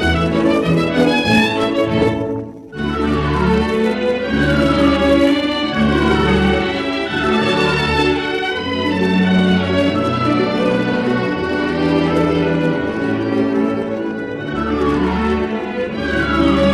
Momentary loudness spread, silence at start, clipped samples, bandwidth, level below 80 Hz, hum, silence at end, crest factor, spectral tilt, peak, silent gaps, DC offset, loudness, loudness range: 7 LU; 0 s; under 0.1%; 12.5 kHz; -32 dBFS; none; 0 s; 14 dB; -6.5 dB/octave; -2 dBFS; none; under 0.1%; -16 LUFS; 3 LU